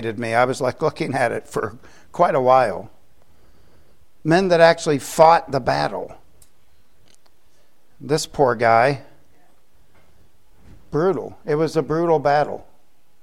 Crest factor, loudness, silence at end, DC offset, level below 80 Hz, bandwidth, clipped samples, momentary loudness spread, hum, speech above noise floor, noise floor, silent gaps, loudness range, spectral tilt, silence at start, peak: 20 dB; -19 LUFS; 0.65 s; 0.7%; -52 dBFS; 16.5 kHz; under 0.1%; 15 LU; none; 44 dB; -62 dBFS; none; 5 LU; -5.5 dB/octave; 0 s; 0 dBFS